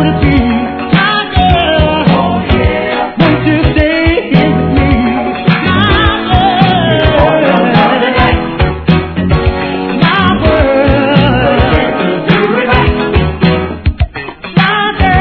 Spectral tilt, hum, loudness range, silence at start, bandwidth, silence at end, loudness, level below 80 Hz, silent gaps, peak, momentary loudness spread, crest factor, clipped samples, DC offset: -9 dB/octave; none; 1 LU; 0 s; 5.4 kHz; 0 s; -10 LUFS; -20 dBFS; none; 0 dBFS; 5 LU; 10 dB; 0.8%; under 0.1%